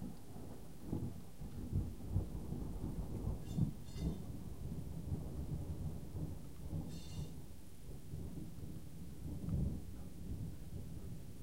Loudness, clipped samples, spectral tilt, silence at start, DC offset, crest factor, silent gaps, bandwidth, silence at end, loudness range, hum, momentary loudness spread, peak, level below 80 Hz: -46 LUFS; under 0.1%; -7.5 dB/octave; 0 s; 0.3%; 20 dB; none; 16 kHz; 0 s; 5 LU; none; 11 LU; -24 dBFS; -50 dBFS